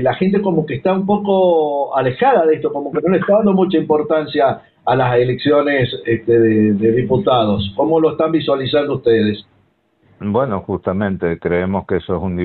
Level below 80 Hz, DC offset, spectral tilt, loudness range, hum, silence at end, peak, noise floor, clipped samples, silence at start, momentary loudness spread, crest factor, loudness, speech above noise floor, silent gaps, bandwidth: -46 dBFS; under 0.1%; -11 dB/octave; 4 LU; none; 0 s; -4 dBFS; -58 dBFS; under 0.1%; 0 s; 7 LU; 12 dB; -16 LUFS; 43 dB; none; 4.5 kHz